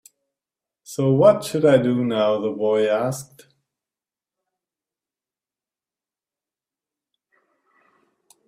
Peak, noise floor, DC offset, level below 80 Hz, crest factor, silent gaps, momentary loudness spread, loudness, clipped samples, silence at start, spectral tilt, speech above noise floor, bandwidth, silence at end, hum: -2 dBFS; under -90 dBFS; under 0.1%; -66 dBFS; 22 dB; none; 10 LU; -19 LUFS; under 0.1%; 0.9 s; -6.5 dB/octave; over 71 dB; 15 kHz; 5.25 s; none